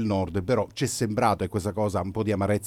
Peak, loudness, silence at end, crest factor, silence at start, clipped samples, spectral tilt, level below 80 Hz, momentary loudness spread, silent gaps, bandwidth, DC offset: -8 dBFS; -26 LUFS; 0 s; 18 dB; 0 s; under 0.1%; -6 dB/octave; -52 dBFS; 4 LU; none; 16 kHz; under 0.1%